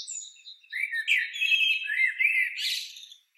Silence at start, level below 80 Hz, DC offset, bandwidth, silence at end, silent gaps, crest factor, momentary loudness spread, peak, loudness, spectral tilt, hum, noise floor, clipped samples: 0 s; under -90 dBFS; under 0.1%; 16.5 kHz; 0.25 s; none; 16 dB; 16 LU; -12 dBFS; -24 LUFS; 12.5 dB/octave; none; -48 dBFS; under 0.1%